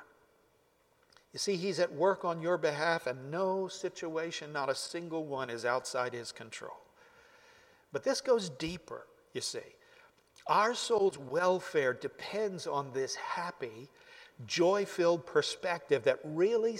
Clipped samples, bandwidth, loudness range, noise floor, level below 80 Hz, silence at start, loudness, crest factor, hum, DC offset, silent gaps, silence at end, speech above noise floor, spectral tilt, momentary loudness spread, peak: under 0.1%; 15.5 kHz; 5 LU; -70 dBFS; -72 dBFS; 0 s; -33 LUFS; 20 dB; none; under 0.1%; none; 0 s; 37 dB; -4 dB/octave; 15 LU; -14 dBFS